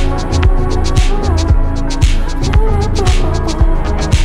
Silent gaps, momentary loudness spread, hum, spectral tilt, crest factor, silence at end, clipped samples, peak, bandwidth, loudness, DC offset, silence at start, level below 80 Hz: none; 3 LU; none; -6 dB/octave; 10 dB; 0 s; under 0.1%; 0 dBFS; 11 kHz; -15 LUFS; under 0.1%; 0 s; -12 dBFS